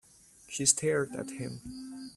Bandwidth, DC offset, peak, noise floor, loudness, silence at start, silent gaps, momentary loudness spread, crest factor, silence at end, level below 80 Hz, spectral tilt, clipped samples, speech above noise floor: 15 kHz; under 0.1%; -10 dBFS; -57 dBFS; -30 LUFS; 0.45 s; none; 18 LU; 24 dB; 0 s; -64 dBFS; -3 dB/octave; under 0.1%; 25 dB